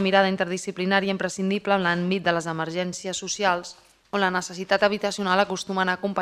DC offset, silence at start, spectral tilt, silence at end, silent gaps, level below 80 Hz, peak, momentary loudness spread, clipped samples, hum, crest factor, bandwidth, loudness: under 0.1%; 0 s; -4 dB/octave; 0 s; none; -64 dBFS; -4 dBFS; 7 LU; under 0.1%; none; 20 dB; 13 kHz; -24 LUFS